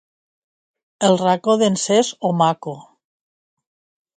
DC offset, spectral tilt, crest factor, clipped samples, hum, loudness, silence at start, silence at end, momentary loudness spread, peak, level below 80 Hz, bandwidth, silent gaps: under 0.1%; -4.5 dB/octave; 18 dB; under 0.1%; none; -18 LUFS; 1 s; 1.35 s; 12 LU; -2 dBFS; -66 dBFS; 9.6 kHz; none